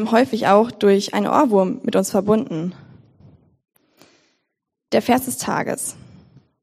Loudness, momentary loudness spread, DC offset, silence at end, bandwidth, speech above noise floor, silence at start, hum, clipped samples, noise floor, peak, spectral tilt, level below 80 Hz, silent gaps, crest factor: -19 LUFS; 11 LU; under 0.1%; 0.7 s; 15.5 kHz; 60 dB; 0 s; none; under 0.1%; -78 dBFS; 0 dBFS; -5 dB/octave; -62 dBFS; none; 20 dB